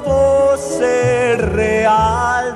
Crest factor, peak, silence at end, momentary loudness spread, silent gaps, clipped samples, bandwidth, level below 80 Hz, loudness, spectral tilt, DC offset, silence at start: 12 dB; -2 dBFS; 0 s; 4 LU; none; under 0.1%; 12.5 kHz; -32 dBFS; -14 LUFS; -5.5 dB/octave; under 0.1%; 0 s